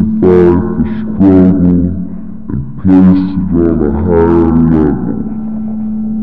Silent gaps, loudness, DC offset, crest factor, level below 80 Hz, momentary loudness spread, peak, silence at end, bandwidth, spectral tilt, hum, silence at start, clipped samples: none; -10 LUFS; 5%; 10 dB; -28 dBFS; 12 LU; 0 dBFS; 0 s; 4.5 kHz; -12 dB/octave; none; 0 s; 0.7%